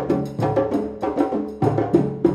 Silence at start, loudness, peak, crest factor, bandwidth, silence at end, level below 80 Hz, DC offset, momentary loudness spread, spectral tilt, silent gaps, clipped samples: 0 s; -22 LUFS; -4 dBFS; 18 dB; 12.5 kHz; 0 s; -50 dBFS; under 0.1%; 5 LU; -9 dB/octave; none; under 0.1%